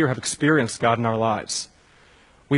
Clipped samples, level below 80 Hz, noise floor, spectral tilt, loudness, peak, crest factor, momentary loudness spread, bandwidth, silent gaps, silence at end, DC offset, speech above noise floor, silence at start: under 0.1%; -60 dBFS; -54 dBFS; -4.5 dB/octave; -22 LUFS; -4 dBFS; 18 dB; 9 LU; 11 kHz; none; 0 s; under 0.1%; 32 dB; 0 s